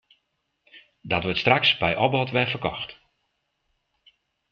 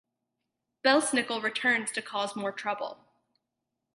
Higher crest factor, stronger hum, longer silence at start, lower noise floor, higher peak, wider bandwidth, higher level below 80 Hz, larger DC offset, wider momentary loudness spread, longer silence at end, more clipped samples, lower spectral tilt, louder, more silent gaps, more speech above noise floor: about the same, 24 dB vs 22 dB; neither; about the same, 0.75 s vs 0.85 s; second, -76 dBFS vs -85 dBFS; first, -2 dBFS vs -10 dBFS; second, 6.8 kHz vs 11.5 kHz; first, -56 dBFS vs -84 dBFS; neither; about the same, 11 LU vs 9 LU; first, 1.6 s vs 1 s; neither; first, -6.5 dB/octave vs -2 dB/octave; first, -22 LUFS vs -28 LUFS; neither; second, 52 dB vs 56 dB